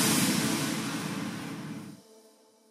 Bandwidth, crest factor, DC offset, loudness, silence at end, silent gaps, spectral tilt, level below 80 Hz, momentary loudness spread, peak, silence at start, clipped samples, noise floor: 16 kHz; 18 dB; under 0.1%; -30 LUFS; 0.5 s; none; -3 dB/octave; -68 dBFS; 17 LU; -14 dBFS; 0 s; under 0.1%; -60 dBFS